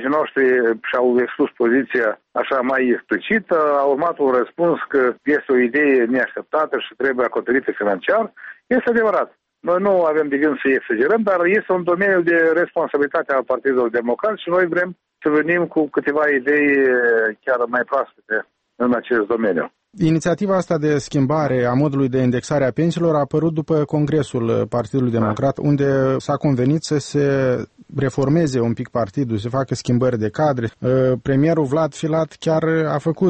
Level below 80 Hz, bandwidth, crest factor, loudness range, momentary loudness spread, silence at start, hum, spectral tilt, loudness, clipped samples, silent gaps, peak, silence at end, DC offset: -54 dBFS; 8.8 kHz; 12 dB; 2 LU; 6 LU; 0 s; none; -7 dB/octave; -18 LUFS; under 0.1%; none; -6 dBFS; 0 s; under 0.1%